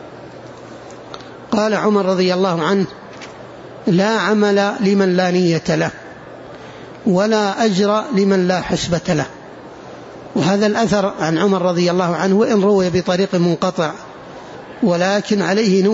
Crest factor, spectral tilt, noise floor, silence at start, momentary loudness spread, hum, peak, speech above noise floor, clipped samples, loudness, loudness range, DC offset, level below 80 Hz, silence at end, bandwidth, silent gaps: 14 dB; -6 dB/octave; -35 dBFS; 0 s; 21 LU; none; -4 dBFS; 20 dB; under 0.1%; -16 LUFS; 3 LU; under 0.1%; -52 dBFS; 0 s; 8 kHz; none